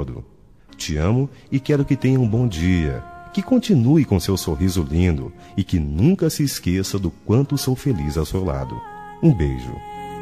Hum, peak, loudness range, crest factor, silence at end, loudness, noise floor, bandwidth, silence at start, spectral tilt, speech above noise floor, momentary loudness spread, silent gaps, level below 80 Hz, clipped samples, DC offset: none; -4 dBFS; 2 LU; 16 dB; 0 s; -20 LUFS; -48 dBFS; 14 kHz; 0 s; -6.5 dB/octave; 29 dB; 13 LU; none; -34 dBFS; under 0.1%; 0.2%